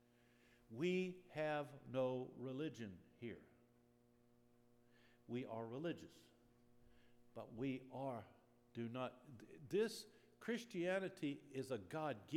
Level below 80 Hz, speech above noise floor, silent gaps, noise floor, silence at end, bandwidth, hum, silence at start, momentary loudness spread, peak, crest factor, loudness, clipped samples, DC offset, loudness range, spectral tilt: -84 dBFS; 28 dB; none; -74 dBFS; 0 s; 16.5 kHz; none; 0.7 s; 16 LU; -30 dBFS; 18 dB; -47 LUFS; under 0.1%; under 0.1%; 8 LU; -6 dB/octave